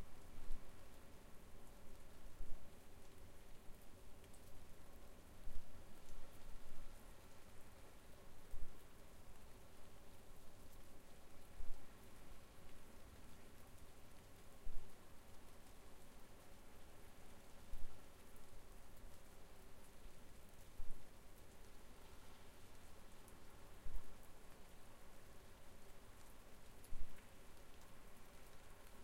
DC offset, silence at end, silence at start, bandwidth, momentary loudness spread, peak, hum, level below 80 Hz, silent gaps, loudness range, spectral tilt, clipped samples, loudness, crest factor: under 0.1%; 0 s; 0 s; 16 kHz; 4 LU; -28 dBFS; none; -56 dBFS; none; 1 LU; -4.5 dB/octave; under 0.1%; -63 LUFS; 18 dB